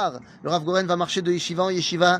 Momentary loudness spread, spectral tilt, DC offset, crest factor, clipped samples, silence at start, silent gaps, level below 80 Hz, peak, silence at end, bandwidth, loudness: 5 LU; -4.5 dB/octave; under 0.1%; 18 dB; under 0.1%; 0 s; none; -66 dBFS; -4 dBFS; 0 s; 10.5 kHz; -23 LUFS